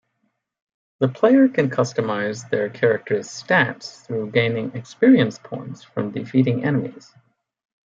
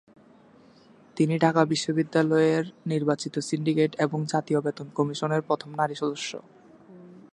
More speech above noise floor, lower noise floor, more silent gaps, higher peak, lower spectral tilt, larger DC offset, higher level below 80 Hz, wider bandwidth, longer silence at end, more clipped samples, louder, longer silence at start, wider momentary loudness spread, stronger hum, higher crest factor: first, 52 dB vs 30 dB; first, -72 dBFS vs -55 dBFS; neither; first, -2 dBFS vs -6 dBFS; about the same, -6.5 dB/octave vs -6 dB/octave; neither; first, -66 dBFS vs -72 dBFS; second, 7.6 kHz vs 11 kHz; first, 0.85 s vs 0.15 s; neither; first, -20 LUFS vs -26 LUFS; second, 1 s vs 1.15 s; first, 15 LU vs 8 LU; neither; about the same, 18 dB vs 22 dB